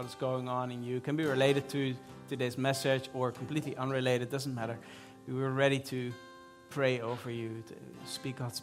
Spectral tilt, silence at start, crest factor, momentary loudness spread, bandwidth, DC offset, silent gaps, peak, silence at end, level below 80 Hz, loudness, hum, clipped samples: -5.5 dB/octave; 0 s; 22 dB; 16 LU; 16 kHz; under 0.1%; none; -12 dBFS; 0 s; -72 dBFS; -34 LUFS; none; under 0.1%